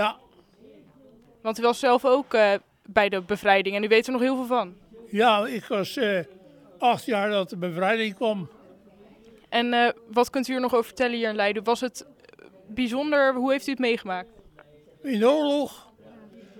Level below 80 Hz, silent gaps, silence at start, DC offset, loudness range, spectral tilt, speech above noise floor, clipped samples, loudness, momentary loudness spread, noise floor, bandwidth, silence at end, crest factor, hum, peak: -64 dBFS; none; 0 s; under 0.1%; 4 LU; -4.5 dB/octave; 31 dB; under 0.1%; -24 LUFS; 11 LU; -55 dBFS; 18.5 kHz; 0 s; 22 dB; none; -4 dBFS